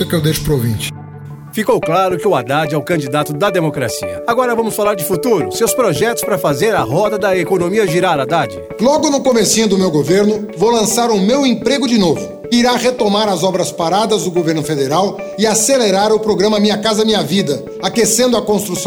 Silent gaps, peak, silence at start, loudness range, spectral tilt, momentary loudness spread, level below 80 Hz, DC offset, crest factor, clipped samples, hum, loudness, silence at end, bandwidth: none; 0 dBFS; 0 s; 3 LU; -4 dB/octave; 6 LU; -44 dBFS; under 0.1%; 14 dB; under 0.1%; none; -14 LUFS; 0 s; over 20 kHz